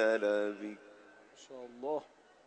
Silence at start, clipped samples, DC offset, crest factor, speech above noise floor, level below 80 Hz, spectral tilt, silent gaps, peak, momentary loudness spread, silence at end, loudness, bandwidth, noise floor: 0 s; under 0.1%; under 0.1%; 20 dB; 24 dB; -86 dBFS; -4.5 dB/octave; none; -18 dBFS; 23 LU; 0.4 s; -36 LUFS; 9 kHz; -59 dBFS